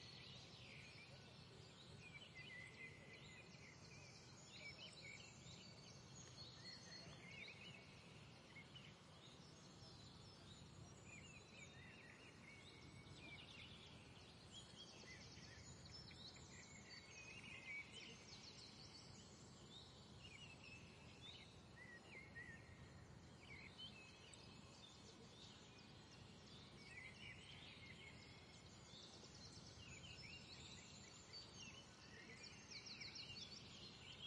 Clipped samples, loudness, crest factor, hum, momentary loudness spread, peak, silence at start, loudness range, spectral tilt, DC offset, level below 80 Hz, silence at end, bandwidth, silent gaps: under 0.1%; -59 LUFS; 18 dB; none; 6 LU; -44 dBFS; 0 s; 4 LU; -3 dB/octave; under 0.1%; -78 dBFS; 0 s; 11 kHz; none